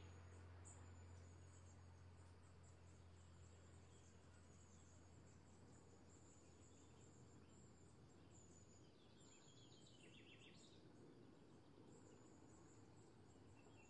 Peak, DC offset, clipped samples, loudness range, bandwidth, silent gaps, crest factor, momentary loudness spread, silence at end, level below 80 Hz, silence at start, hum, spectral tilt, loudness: -50 dBFS; under 0.1%; under 0.1%; 3 LU; 10 kHz; none; 16 dB; 5 LU; 0 s; -84 dBFS; 0 s; none; -5 dB/octave; -67 LUFS